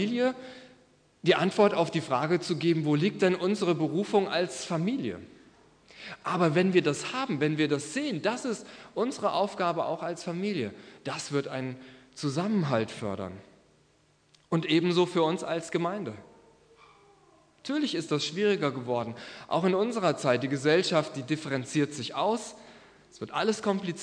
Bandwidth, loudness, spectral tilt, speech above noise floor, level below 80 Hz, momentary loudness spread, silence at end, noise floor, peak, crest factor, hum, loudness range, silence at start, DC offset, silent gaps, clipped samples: 10.5 kHz; -29 LUFS; -5.5 dB/octave; 37 dB; -72 dBFS; 13 LU; 0 s; -65 dBFS; -8 dBFS; 20 dB; none; 5 LU; 0 s; under 0.1%; none; under 0.1%